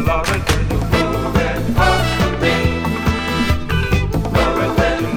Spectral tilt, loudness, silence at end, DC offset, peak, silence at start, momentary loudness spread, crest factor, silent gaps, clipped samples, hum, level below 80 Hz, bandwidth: -5.5 dB/octave; -17 LUFS; 0 s; under 0.1%; 0 dBFS; 0 s; 3 LU; 16 dB; none; under 0.1%; none; -24 dBFS; 19 kHz